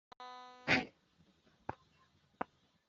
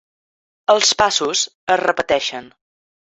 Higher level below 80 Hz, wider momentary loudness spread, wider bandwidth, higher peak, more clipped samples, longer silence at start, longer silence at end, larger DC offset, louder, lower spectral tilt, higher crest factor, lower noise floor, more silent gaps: second, -72 dBFS vs -56 dBFS; first, 18 LU vs 11 LU; about the same, 7.6 kHz vs 8.2 kHz; second, -14 dBFS vs 0 dBFS; neither; second, 0.2 s vs 0.7 s; second, 0.45 s vs 0.6 s; neither; second, -37 LUFS vs -17 LUFS; first, -2 dB/octave vs -0.5 dB/octave; first, 30 dB vs 18 dB; second, -72 dBFS vs under -90 dBFS; second, none vs 1.55-1.67 s